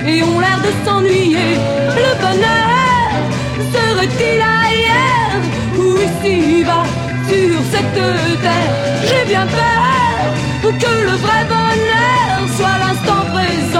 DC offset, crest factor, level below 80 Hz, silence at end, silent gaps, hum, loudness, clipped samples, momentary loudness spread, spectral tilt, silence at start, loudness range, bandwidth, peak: under 0.1%; 12 dB; -36 dBFS; 0 s; none; none; -13 LUFS; under 0.1%; 4 LU; -5 dB/octave; 0 s; 1 LU; 16 kHz; -2 dBFS